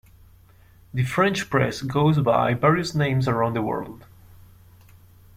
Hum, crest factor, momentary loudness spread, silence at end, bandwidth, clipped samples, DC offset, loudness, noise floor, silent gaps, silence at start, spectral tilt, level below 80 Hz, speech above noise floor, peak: none; 18 dB; 9 LU; 1.4 s; 15.5 kHz; under 0.1%; under 0.1%; -22 LUFS; -52 dBFS; none; 0.95 s; -6.5 dB/octave; -52 dBFS; 30 dB; -6 dBFS